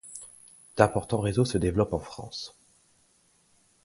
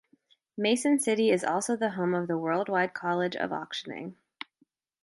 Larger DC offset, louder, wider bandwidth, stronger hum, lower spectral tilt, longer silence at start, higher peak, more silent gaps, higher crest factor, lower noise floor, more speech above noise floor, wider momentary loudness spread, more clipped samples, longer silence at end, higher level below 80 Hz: neither; about the same, -27 LUFS vs -28 LUFS; about the same, 11.5 kHz vs 12 kHz; neither; first, -6 dB/octave vs -4.5 dB/octave; second, 0.05 s vs 0.55 s; first, -4 dBFS vs -14 dBFS; neither; first, 26 dB vs 16 dB; second, -65 dBFS vs -71 dBFS; second, 39 dB vs 43 dB; about the same, 18 LU vs 20 LU; neither; first, 1.35 s vs 0.9 s; first, -48 dBFS vs -78 dBFS